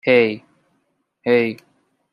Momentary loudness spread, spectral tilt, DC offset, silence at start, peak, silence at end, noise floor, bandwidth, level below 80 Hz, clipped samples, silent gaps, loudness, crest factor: 18 LU; -7 dB/octave; under 0.1%; 0.05 s; -2 dBFS; 0.6 s; -68 dBFS; 5.4 kHz; -68 dBFS; under 0.1%; none; -19 LUFS; 18 dB